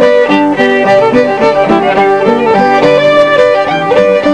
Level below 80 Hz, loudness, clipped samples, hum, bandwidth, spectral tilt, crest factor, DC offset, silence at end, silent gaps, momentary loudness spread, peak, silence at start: -44 dBFS; -8 LUFS; 0.9%; none; 10 kHz; -6 dB/octave; 8 dB; 0.7%; 0 s; none; 2 LU; 0 dBFS; 0 s